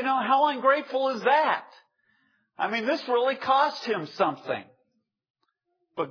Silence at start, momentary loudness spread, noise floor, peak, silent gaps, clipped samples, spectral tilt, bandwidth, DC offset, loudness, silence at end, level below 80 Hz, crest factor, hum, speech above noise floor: 0 s; 11 LU; -76 dBFS; -8 dBFS; 5.30-5.34 s; under 0.1%; -5 dB/octave; 5.4 kHz; under 0.1%; -25 LUFS; 0 s; -80 dBFS; 18 dB; none; 51 dB